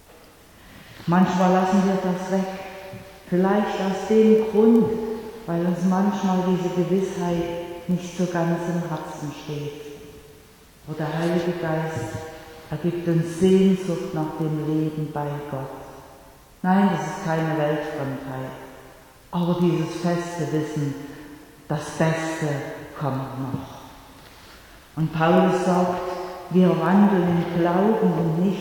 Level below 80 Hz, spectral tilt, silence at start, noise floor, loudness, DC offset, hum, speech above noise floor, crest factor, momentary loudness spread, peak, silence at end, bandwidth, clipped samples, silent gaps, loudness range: -54 dBFS; -7 dB/octave; 0.65 s; -50 dBFS; -23 LUFS; under 0.1%; none; 28 dB; 18 dB; 17 LU; -6 dBFS; 0 s; 18.5 kHz; under 0.1%; none; 8 LU